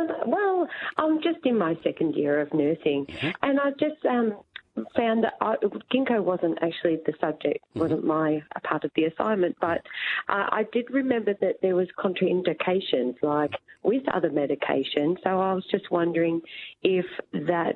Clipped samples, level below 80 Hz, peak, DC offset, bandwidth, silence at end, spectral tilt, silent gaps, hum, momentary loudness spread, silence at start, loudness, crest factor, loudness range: under 0.1%; -70 dBFS; -4 dBFS; under 0.1%; 5 kHz; 0 s; -8.5 dB/octave; none; none; 4 LU; 0 s; -26 LUFS; 20 dB; 1 LU